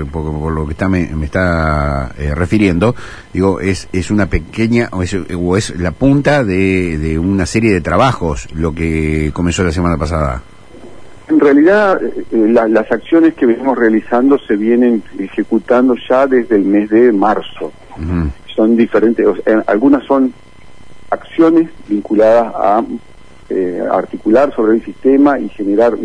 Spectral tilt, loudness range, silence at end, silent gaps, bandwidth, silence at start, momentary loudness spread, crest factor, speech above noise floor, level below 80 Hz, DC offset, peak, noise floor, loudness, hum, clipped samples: -7 dB/octave; 3 LU; 0 s; none; 10.5 kHz; 0 s; 9 LU; 12 dB; 28 dB; -30 dBFS; 2%; 0 dBFS; -40 dBFS; -13 LUFS; none; under 0.1%